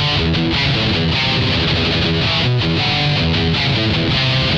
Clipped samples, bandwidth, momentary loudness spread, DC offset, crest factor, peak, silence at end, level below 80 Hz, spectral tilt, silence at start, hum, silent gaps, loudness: under 0.1%; 8.2 kHz; 1 LU; under 0.1%; 10 dB; -4 dBFS; 0 s; -30 dBFS; -5.5 dB/octave; 0 s; none; none; -15 LUFS